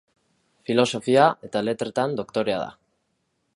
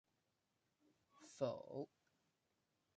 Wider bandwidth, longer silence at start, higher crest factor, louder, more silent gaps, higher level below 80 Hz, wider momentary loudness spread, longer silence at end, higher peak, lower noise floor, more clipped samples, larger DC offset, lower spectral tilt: first, 11.5 kHz vs 9 kHz; second, 0.7 s vs 1.15 s; about the same, 22 dB vs 24 dB; first, -23 LUFS vs -48 LUFS; neither; first, -66 dBFS vs under -90 dBFS; second, 10 LU vs 18 LU; second, 0.85 s vs 1.1 s; first, -2 dBFS vs -28 dBFS; second, -73 dBFS vs -87 dBFS; neither; neither; about the same, -5 dB/octave vs -6 dB/octave